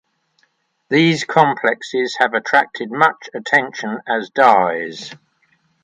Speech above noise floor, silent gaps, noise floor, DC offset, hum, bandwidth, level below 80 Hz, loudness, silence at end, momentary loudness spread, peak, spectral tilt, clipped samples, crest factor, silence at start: 47 dB; none; -64 dBFS; under 0.1%; none; 10 kHz; -68 dBFS; -16 LUFS; 0.7 s; 12 LU; 0 dBFS; -5 dB/octave; under 0.1%; 18 dB; 0.9 s